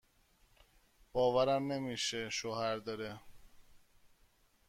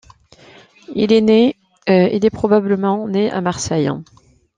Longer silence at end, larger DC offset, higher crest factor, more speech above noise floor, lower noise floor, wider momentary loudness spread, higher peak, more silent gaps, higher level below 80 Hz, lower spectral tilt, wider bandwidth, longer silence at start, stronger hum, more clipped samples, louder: about the same, 0.6 s vs 0.55 s; neither; about the same, 20 dB vs 16 dB; first, 35 dB vs 31 dB; first, -70 dBFS vs -46 dBFS; first, 13 LU vs 9 LU; second, -20 dBFS vs -2 dBFS; neither; second, -66 dBFS vs -52 dBFS; second, -4 dB/octave vs -6 dB/octave; first, 15.5 kHz vs 9.6 kHz; first, 1.15 s vs 0.9 s; neither; neither; second, -36 LUFS vs -16 LUFS